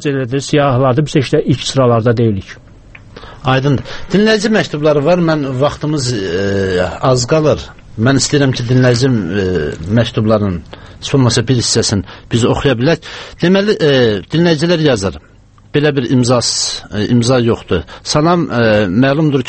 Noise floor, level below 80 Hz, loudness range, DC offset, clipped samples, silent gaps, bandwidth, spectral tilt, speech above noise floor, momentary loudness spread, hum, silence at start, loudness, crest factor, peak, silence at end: -37 dBFS; -38 dBFS; 2 LU; under 0.1%; under 0.1%; none; 8.8 kHz; -5.5 dB/octave; 25 dB; 7 LU; none; 0 s; -13 LUFS; 12 dB; 0 dBFS; 0 s